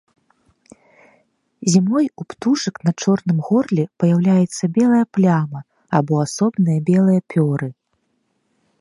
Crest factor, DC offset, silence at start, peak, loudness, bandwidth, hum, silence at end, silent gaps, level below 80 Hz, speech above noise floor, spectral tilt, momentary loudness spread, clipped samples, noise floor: 18 dB; under 0.1%; 1.6 s; 0 dBFS; -18 LUFS; 11.5 kHz; none; 1.1 s; none; -64 dBFS; 52 dB; -7 dB/octave; 7 LU; under 0.1%; -68 dBFS